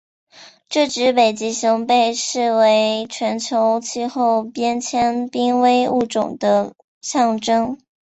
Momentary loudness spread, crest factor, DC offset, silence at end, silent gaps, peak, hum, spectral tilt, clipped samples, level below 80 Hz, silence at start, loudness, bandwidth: 8 LU; 16 dB; under 0.1%; 0.35 s; 6.84-7.01 s; -2 dBFS; none; -3.5 dB/octave; under 0.1%; -60 dBFS; 0.35 s; -18 LUFS; 8.2 kHz